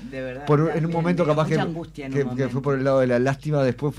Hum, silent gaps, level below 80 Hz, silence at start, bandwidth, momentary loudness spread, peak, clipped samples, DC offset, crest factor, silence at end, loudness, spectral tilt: none; none; -50 dBFS; 0 s; 11 kHz; 8 LU; -8 dBFS; under 0.1%; under 0.1%; 14 dB; 0 s; -22 LUFS; -8 dB/octave